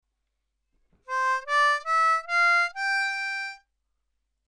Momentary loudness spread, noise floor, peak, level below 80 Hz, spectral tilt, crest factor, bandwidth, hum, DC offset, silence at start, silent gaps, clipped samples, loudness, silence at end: 10 LU; -79 dBFS; -14 dBFS; -72 dBFS; 3.5 dB/octave; 12 dB; 12.5 kHz; none; under 0.1%; 1.1 s; none; under 0.1%; -24 LUFS; 0.9 s